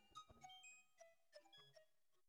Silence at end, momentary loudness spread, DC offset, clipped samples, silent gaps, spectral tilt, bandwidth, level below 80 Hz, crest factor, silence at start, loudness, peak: 0.05 s; 6 LU; under 0.1%; under 0.1%; none; -1.5 dB/octave; 13 kHz; -88 dBFS; 20 dB; 0 s; -64 LUFS; -48 dBFS